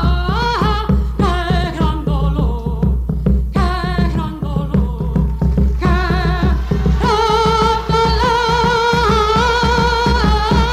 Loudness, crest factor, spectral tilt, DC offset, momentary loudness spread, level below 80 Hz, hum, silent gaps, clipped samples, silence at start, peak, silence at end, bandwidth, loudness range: -16 LUFS; 12 dB; -6.5 dB/octave; under 0.1%; 5 LU; -18 dBFS; none; none; under 0.1%; 0 s; -2 dBFS; 0 s; 10 kHz; 4 LU